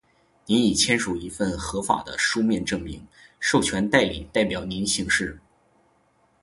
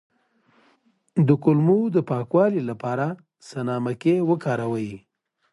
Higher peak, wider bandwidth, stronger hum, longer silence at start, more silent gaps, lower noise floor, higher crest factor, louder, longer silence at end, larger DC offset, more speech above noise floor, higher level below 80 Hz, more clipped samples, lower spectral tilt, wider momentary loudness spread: about the same, -2 dBFS vs -4 dBFS; about the same, 11.5 kHz vs 11.5 kHz; neither; second, 0.45 s vs 1.15 s; neither; about the same, -64 dBFS vs -63 dBFS; about the same, 22 dB vs 18 dB; about the same, -23 LUFS vs -22 LUFS; first, 1.05 s vs 0.55 s; neither; about the same, 40 dB vs 41 dB; first, -46 dBFS vs -64 dBFS; neither; second, -3.5 dB/octave vs -9 dB/octave; second, 9 LU vs 12 LU